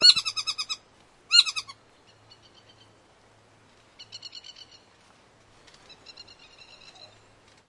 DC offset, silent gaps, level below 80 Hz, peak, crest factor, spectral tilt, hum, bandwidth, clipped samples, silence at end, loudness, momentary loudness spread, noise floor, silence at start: under 0.1%; none; -72 dBFS; -4 dBFS; 26 dB; 1.5 dB/octave; none; 11.5 kHz; under 0.1%; 1.45 s; -22 LUFS; 29 LU; -58 dBFS; 0 s